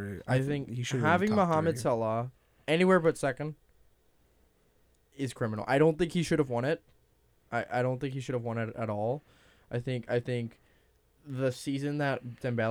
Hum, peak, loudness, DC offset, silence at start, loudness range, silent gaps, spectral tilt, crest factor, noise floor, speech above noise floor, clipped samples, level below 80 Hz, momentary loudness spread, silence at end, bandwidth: none; -12 dBFS; -30 LUFS; under 0.1%; 0 s; 7 LU; none; -6.5 dB/octave; 20 dB; -67 dBFS; 37 dB; under 0.1%; -62 dBFS; 12 LU; 0 s; 16 kHz